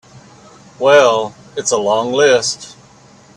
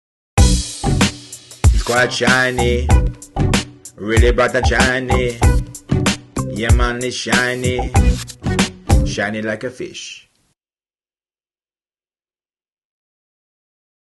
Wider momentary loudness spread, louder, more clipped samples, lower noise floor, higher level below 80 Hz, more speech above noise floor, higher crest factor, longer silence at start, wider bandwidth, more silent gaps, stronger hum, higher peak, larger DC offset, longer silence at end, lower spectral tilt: first, 14 LU vs 11 LU; first, -14 LUFS vs -17 LUFS; neither; second, -44 dBFS vs under -90 dBFS; second, -60 dBFS vs -22 dBFS; second, 31 dB vs over 75 dB; about the same, 16 dB vs 16 dB; second, 0.15 s vs 0.35 s; about the same, 11.5 kHz vs 12.5 kHz; neither; neither; about the same, 0 dBFS vs 0 dBFS; neither; second, 0.65 s vs 3.9 s; second, -2.5 dB/octave vs -4.5 dB/octave